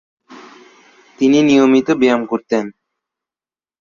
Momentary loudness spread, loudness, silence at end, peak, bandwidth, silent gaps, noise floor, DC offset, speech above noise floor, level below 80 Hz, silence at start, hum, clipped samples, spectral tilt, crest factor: 10 LU; -14 LUFS; 1.1 s; -2 dBFS; 7.2 kHz; none; under -90 dBFS; under 0.1%; over 77 dB; -58 dBFS; 0.3 s; none; under 0.1%; -5.5 dB/octave; 16 dB